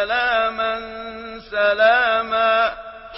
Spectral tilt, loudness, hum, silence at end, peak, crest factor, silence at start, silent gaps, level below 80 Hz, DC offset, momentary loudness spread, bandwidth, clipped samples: -6.5 dB/octave; -18 LUFS; none; 0 s; -4 dBFS; 16 dB; 0 s; none; -50 dBFS; under 0.1%; 17 LU; 5.8 kHz; under 0.1%